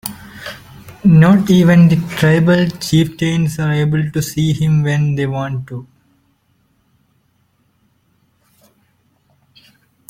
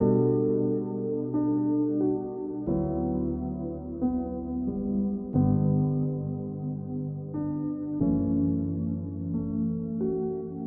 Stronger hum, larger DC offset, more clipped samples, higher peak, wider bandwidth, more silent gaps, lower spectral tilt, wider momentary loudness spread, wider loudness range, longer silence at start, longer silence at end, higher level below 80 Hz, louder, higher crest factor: neither; neither; neither; first, -2 dBFS vs -12 dBFS; first, 17 kHz vs 1.9 kHz; neither; second, -7 dB/octave vs -12.5 dB/octave; first, 21 LU vs 9 LU; first, 12 LU vs 2 LU; about the same, 0.05 s vs 0 s; first, 4.25 s vs 0 s; about the same, -46 dBFS vs -48 dBFS; first, -13 LUFS vs -29 LUFS; about the same, 14 dB vs 16 dB